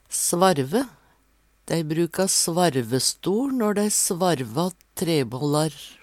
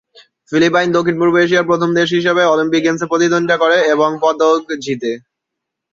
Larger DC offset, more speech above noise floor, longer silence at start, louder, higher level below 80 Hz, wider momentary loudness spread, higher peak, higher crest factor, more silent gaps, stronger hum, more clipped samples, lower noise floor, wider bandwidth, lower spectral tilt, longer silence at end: neither; second, 40 dB vs 65 dB; second, 0.1 s vs 0.5 s; second, -23 LUFS vs -14 LUFS; about the same, -62 dBFS vs -58 dBFS; about the same, 8 LU vs 8 LU; about the same, -4 dBFS vs -2 dBFS; about the same, 18 dB vs 14 dB; neither; neither; neither; second, -62 dBFS vs -79 dBFS; first, 17 kHz vs 7.6 kHz; about the same, -4 dB/octave vs -5 dB/octave; second, 0.1 s vs 0.75 s